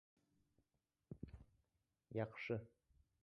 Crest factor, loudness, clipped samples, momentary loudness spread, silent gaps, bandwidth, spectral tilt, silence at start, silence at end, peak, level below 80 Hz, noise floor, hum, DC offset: 24 dB; -49 LUFS; under 0.1%; 18 LU; none; 6.2 kHz; -6 dB/octave; 1.1 s; 0.55 s; -30 dBFS; -72 dBFS; -89 dBFS; none; under 0.1%